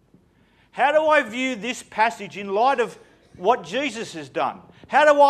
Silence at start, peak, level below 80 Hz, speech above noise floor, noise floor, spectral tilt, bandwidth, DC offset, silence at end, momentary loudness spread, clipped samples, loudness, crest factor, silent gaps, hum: 0.75 s; -2 dBFS; -66 dBFS; 38 dB; -59 dBFS; -3.5 dB/octave; 12.5 kHz; under 0.1%; 0 s; 12 LU; under 0.1%; -22 LUFS; 18 dB; none; none